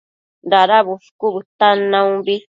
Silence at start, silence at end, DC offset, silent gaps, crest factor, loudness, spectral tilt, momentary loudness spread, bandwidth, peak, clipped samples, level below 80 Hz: 0.45 s; 0.15 s; under 0.1%; 1.11-1.19 s, 1.45-1.59 s; 16 dB; -15 LUFS; -6 dB/octave; 10 LU; 7.6 kHz; 0 dBFS; under 0.1%; -72 dBFS